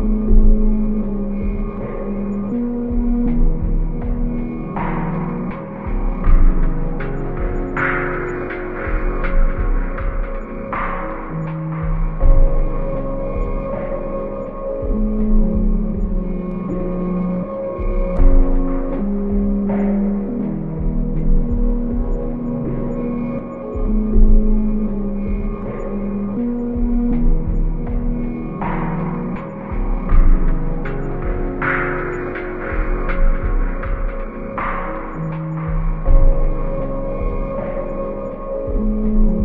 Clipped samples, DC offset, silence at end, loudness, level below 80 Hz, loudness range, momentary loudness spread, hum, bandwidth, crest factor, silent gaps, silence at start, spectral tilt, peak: under 0.1%; under 0.1%; 0 s; -22 LUFS; -18 dBFS; 2 LU; 7 LU; none; 3 kHz; 16 dB; none; 0 s; -11 dB/octave; 0 dBFS